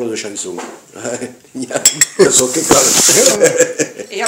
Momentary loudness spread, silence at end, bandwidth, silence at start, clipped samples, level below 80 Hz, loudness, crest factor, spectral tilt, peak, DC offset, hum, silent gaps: 20 LU; 0 s; over 20 kHz; 0 s; 0.3%; -48 dBFS; -10 LUFS; 14 dB; -1.5 dB/octave; 0 dBFS; under 0.1%; none; none